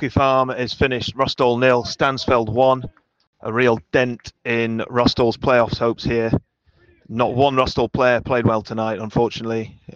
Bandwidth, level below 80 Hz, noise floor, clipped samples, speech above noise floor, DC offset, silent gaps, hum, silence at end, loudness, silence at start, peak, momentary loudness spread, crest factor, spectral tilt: 7.6 kHz; -42 dBFS; -56 dBFS; under 0.1%; 38 dB; under 0.1%; 3.27-3.33 s; none; 0.05 s; -19 LUFS; 0 s; -4 dBFS; 8 LU; 16 dB; -6 dB/octave